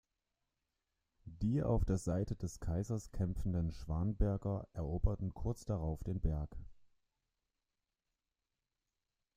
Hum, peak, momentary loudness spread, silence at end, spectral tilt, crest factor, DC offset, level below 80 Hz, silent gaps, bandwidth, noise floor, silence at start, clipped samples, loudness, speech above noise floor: none; -18 dBFS; 7 LU; 2.5 s; -8.5 dB/octave; 20 dB; under 0.1%; -46 dBFS; none; 15 kHz; under -90 dBFS; 1.25 s; under 0.1%; -39 LUFS; over 53 dB